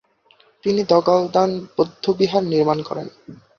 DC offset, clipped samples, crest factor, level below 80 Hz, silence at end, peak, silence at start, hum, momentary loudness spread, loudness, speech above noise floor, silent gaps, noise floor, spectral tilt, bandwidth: under 0.1%; under 0.1%; 18 dB; -60 dBFS; 0.25 s; -2 dBFS; 0.65 s; none; 12 LU; -19 LUFS; 37 dB; none; -56 dBFS; -6.5 dB/octave; 7 kHz